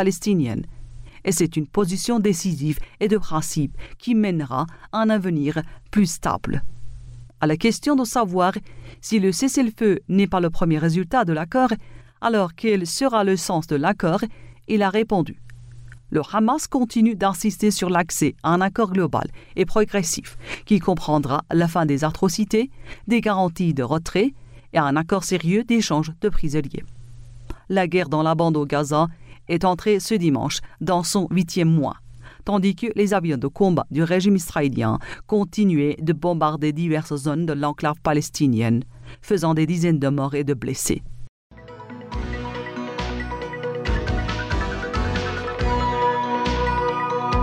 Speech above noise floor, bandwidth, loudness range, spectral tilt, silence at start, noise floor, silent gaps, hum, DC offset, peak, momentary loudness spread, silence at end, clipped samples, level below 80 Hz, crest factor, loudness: 20 dB; 16 kHz; 3 LU; -5.5 dB/octave; 0 s; -41 dBFS; 41.29-41.50 s; none; under 0.1%; -6 dBFS; 9 LU; 0 s; under 0.1%; -38 dBFS; 16 dB; -22 LUFS